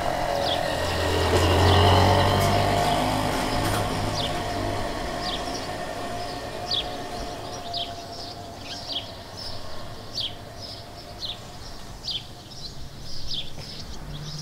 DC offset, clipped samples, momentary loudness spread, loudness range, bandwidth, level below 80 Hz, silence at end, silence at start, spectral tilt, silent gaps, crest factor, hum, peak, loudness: under 0.1%; under 0.1%; 18 LU; 13 LU; 16 kHz; -40 dBFS; 0 s; 0 s; -4.5 dB/octave; none; 20 dB; none; -6 dBFS; -25 LUFS